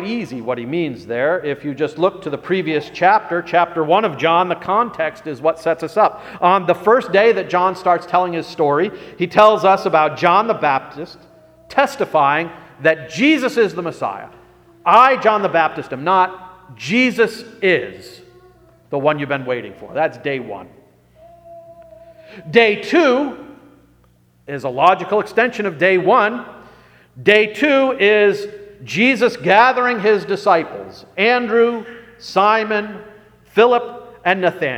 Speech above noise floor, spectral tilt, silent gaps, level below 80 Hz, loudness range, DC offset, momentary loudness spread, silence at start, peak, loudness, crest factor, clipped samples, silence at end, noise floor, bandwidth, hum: 38 dB; -5.5 dB/octave; none; -60 dBFS; 5 LU; under 0.1%; 13 LU; 0 s; 0 dBFS; -16 LUFS; 18 dB; under 0.1%; 0 s; -54 dBFS; 15 kHz; 60 Hz at -55 dBFS